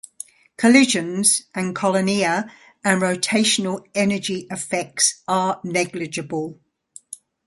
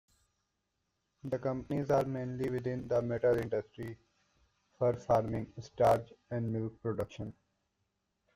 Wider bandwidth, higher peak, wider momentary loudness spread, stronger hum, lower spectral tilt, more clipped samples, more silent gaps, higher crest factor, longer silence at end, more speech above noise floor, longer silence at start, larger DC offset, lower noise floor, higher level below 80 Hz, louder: second, 12 kHz vs 15.5 kHz; first, 0 dBFS vs -16 dBFS; about the same, 18 LU vs 16 LU; neither; second, -3 dB/octave vs -8 dB/octave; neither; neither; about the same, 20 dB vs 20 dB; second, 0.3 s vs 1.05 s; second, 28 dB vs 50 dB; second, 0.6 s vs 1.25 s; neither; second, -48 dBFS vs -83 dBFS; about the same, -64 dBFS vs -62 dBFS; first, -20 LUFS vs -34 LUFS